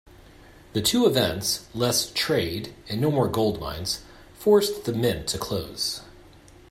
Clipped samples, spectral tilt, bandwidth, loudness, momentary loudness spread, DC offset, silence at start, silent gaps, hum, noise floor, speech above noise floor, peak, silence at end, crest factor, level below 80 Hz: under 0.1%; -4 dB/octave; 16 kHz; -24 LUFS; 10 LU; under 0.1%; 0.75 s; none; none; -50 dBFS; 26 dB; -6 dBFS; 0.6 s; 20 dB; -50 dBFS